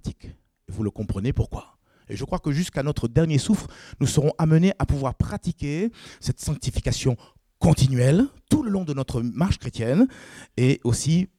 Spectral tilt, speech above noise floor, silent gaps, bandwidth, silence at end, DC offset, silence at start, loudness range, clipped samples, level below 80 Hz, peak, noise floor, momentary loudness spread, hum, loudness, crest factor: -6.5 dB/octave; 22 dB; none; 14 kHz; 0.15 s; under 0.1%; 0.05 s; 3 LU; under 0.1%; -38 dBFS; -6 dBFS; -45 dBFS; 13 LU; none; -24 LUFS; 18 dB